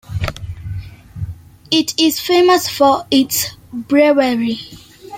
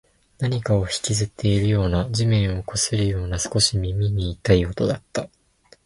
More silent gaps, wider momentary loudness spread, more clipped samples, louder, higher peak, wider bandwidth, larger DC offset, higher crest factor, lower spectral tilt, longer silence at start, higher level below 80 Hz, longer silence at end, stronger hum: neither; first, 18 LU vs 6 LU; neither; first, -15 LUFS vs -22 LUFS; about the same, -2 dBFS vs -2 dBFS; first, 16.5 kHz vs 11.5 kHz; neither; second, 14 dB vs 20 dB; about the same, -4 dB/octave vs -5 dB/octave; second, 0.1 s vs 0.4 s; about the same, -40 dBFS vs -36 dBFS; second, 0 s vs 0.6 s; neither